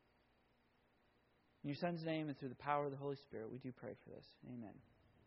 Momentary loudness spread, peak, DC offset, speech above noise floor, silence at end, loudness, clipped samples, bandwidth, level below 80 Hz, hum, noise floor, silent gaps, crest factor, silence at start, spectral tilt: 16 LU; -24 dBFS; under 0.1%; 31 dB; 0.45 s; -46 LUFS; under 0.1%; 5.8 kHz; -80 dBFS; none; -77 dBFS; none; 24 dB; 1.65 s; -5.5 dB/octave